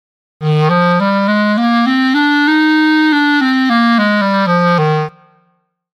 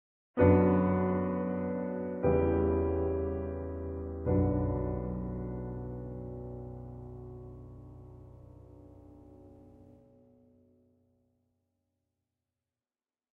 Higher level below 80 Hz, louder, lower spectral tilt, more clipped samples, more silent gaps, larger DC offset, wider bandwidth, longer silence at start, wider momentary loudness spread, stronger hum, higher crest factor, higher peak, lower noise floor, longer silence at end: second, -64 dBFS vs -46 dBFS; first, -12 LUFS vs -31 LUFS; second, -7 dB/octave vs -12.5 dB/octave; neither; neither; neither; first, 11 kHz vs 3.4 kHz; about the same, 0.4 s vs 0.35 s; second, 4 LU vs 22 LU; neither; second, 10 dB vs 24 dB; first, -2 dBFS vs -10 dBFS; second, -60 dBFS vs under -90 dBFS; second, 0.9 s vs 3.5 s